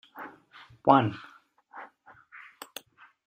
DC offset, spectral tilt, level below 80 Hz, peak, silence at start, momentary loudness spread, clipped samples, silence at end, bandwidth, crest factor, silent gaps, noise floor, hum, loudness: under 0.1%; -6.5 dB/octave; -70 dBFS; -6 dBFS; 0.15 s; 27 LU; under 0.1%; 1.4 s; 16 kHz; 26 dB; none; -56 dBFS; none; -24 LUFS